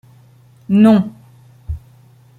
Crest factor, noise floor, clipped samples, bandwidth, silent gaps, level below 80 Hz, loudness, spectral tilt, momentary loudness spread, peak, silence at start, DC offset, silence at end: 16 dB; -47 dBFS; under 0.1%; 10 kHz; none; -40 dBFS; -13 LUFS; -9 dB/octave; 20 LU; -2 dBFS; 0.7 s; under 0.1%; 0.6 s